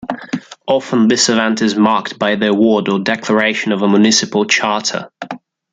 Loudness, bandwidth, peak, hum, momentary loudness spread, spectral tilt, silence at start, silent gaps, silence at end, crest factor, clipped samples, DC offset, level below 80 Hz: -14 LUFS; 9.2 kHz; 0 dBFS; none; 13 LU; -3.5 dB/octave; 0 s; none; 0.35 s; 14 dB; under 0.1%; under 0.1%; -60 dBFS